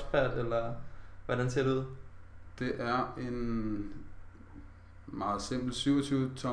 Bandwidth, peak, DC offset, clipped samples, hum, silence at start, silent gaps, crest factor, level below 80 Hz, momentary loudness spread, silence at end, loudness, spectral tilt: 11 kHz; -16 dBFS; under 0.1%; under 0.1%; none; 0 s; none; 18 dB; -48 dBFS; 23 LU; 0 s; -34 LUFS; -6 dB/octave